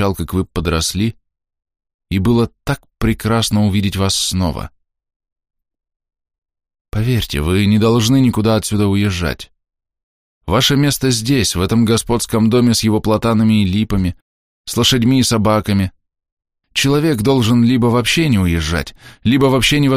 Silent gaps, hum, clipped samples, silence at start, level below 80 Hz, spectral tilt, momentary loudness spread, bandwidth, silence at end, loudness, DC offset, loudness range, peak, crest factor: 1.94-1.99 s, 5.16-5.20 s, 6.38-6.42 s, 6.81-6.85 s, 10.03-10.41 s, 14.22-14.64 s, 16.32-16.37 s; none; under 0.1%; 0 s; -34 dBFS; -5 dB/octave; 9 LU; 15.5 kHz; 0 s; -15 LUFS; under 0.1%; 5 LU; -2 dBFS; 14 dB